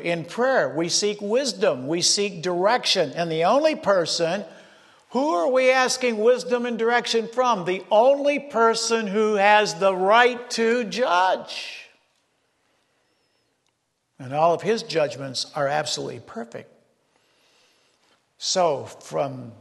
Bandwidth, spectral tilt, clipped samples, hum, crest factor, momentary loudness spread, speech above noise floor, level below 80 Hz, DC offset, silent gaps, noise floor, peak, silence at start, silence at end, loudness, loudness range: 12.5 kHz; -3 dB/octave; under 0.1%; none; 20 dB; 12 LU; 51 dB; -76 dBFS; under 0.1%; none; -72 dBFS; -4 dBFS; 0 s; 0.05 s; -21 LUFS; 9 LU